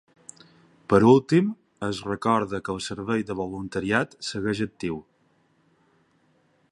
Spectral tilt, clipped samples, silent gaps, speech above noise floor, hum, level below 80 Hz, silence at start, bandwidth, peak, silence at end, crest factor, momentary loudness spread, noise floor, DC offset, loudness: -6 dB/octave; under 0.1%; none; 42 dB; none; -56 dBFS; 0.9 s; 11.5 kHz; -4 dBFS; 1.7 s; 22 dB; 15 LU; -65 dBFS; under 0.1%; -25 LUFS